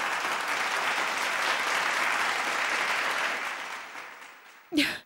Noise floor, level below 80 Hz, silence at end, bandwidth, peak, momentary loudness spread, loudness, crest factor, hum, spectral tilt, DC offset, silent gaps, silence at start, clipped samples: -50 dBFS; -72 dBFS; 0.05 s; 16 kHz; -10 dBFS; 14 LU; -27 LUFS; 18 dB; none; -0.5 dB/octave; under 0.1%; none; 0 s; under 0.1%